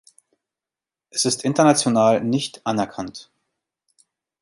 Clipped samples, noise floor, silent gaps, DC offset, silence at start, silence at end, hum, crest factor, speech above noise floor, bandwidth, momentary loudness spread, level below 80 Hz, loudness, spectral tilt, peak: under 0.1%; -90 dBFS; none; under 0.1%; 1.15 s; 1.2 s; none; 20 dB; 70 dB; 11.5 kHz; 15 LU; -64 dBFS; -20 LUFS; -4 dB/octave; -2 dBFS